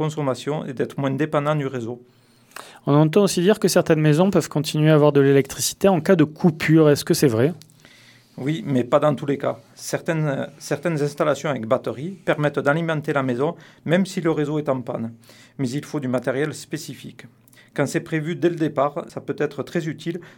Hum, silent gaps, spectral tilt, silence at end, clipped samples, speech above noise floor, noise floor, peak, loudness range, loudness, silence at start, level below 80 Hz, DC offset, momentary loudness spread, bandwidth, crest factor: none; none; -6 dB/octave; 0.1 s; under 0.1%; 30 dB; -51 dBFS; -2 dBFS; 8 LU; -21 LUFS; 0 s; -60 dBFS; under 0.1%; 14 LU; 18.5 kHz; 18 dB